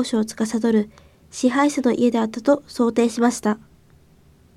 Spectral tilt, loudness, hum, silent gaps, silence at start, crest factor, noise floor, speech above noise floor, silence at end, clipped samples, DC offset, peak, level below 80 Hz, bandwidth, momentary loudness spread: -5 dB/octave; -20 LUFS; none; none; 0 s; 16 dB; -53 dBFS; 33 dB; 1 s; under 0.1%; under 0.1%; -6 dBFS; -58 dBFS; 13.5 kHz; 6 LU